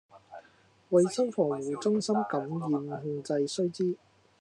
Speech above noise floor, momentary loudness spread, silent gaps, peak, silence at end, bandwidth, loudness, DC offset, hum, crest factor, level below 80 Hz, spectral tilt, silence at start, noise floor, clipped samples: 33 dB; 10 LU; none; -12 dBFS; 0.45 s; 11 kHz; -30 LUFS; under 0.1%; none; 18 dB; -82 dBFS; -6 dB/octave; 0.15 s; -62 dBFS; under 0.1%